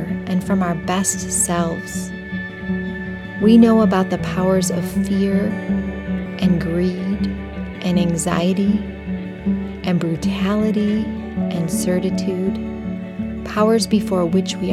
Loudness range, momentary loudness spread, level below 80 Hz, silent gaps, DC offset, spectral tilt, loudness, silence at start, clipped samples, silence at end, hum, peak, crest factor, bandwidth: 4 LU; 11 LU; -38 dBFS; none; under 0.1%; -5.5 dB/octave; -19 LUFS; 0 s; under 0.1%; 0 s; none; -2 dBFS; 18 dB; 15 kHz